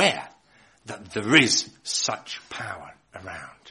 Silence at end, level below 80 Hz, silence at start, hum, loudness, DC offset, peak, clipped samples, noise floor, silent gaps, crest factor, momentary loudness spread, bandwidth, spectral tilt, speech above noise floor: 0 s; -64 dBFS; 0 s; none; -23 LUFS; under 0.1%; -2 dBFS; under 0.1%; -58 dBFS; none; 24 dB; 23 LU; 11.5 kHz; -2.5 dB/octave; 33 dB